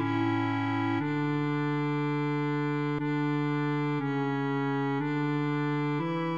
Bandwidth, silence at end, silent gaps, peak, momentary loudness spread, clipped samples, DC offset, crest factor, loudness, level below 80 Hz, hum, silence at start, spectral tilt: 7.4 kHz; 0 s; none; -18 dBFS; 1 LU; under 0.1%; 0.1%; 12 dB; -29 LUFS; -72 dBFS; none; 0 s; -8.5 dB/octave